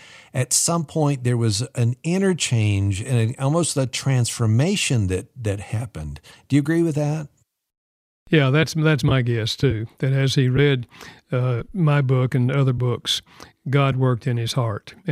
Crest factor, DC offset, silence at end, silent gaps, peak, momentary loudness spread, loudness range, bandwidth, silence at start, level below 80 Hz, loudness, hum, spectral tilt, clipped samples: 18 dB; under 0.1%; 0 s; 7.77-8.26 s; -4 dBFS; 9 LU; 3 LU; 14 kHz; 0.15 s; -48 dBFS; -21 LUFS; none; -5 dB/octave; under 0.1%